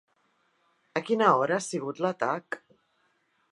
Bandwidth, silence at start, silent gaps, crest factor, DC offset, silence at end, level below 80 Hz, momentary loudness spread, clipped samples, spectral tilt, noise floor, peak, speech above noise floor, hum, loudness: 11.5 kHz; 0.95 s; none; 22 dB; under 0.1%; 0.95 s; -84 dBFS; 13 LU; under 0.1%; -4.5 dB/octave; -71 dBFS; -8 dBFS; 45 dB; none; -27 LUFS